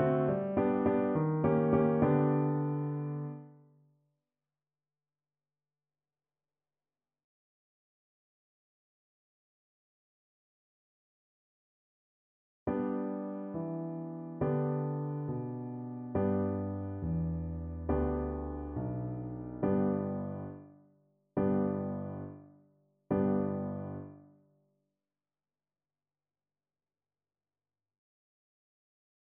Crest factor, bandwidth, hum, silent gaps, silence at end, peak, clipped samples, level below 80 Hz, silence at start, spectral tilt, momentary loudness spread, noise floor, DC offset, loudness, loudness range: 20 dB; 3.5 kHz; none; 7.24-12.66 s; 5 s; -16 dBFS; under 0.1%; -54 dBFS; 0 s; -10.5 dB/octave; 13 LU; under -90 dBFS; under 0.1%; -34 LUFS; 11 LU